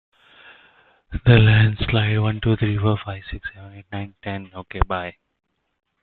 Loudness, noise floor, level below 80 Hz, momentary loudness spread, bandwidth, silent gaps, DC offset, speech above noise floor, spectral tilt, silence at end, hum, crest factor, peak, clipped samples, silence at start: -20 LUFS; -55 dBFS; -36 dBFS; 20 LU; 4.3 kHz; none; under 0.1%; 36 dB; -11 dB/octave; 0.9 s; none; 20 dB; -2 dBFS; under 0.1%; 1.1 s